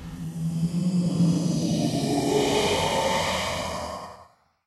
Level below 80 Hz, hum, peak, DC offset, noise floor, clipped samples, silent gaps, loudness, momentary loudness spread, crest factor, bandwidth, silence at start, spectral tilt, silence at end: -48 dBFS; none; -10 dBFS; under 0.1%; -54 dBFS; under 0.1%; none; -25 LUFS; 10 LU; 14 dB; 13.5 kHz; 0 s; -5 dB/octave; 0.45 s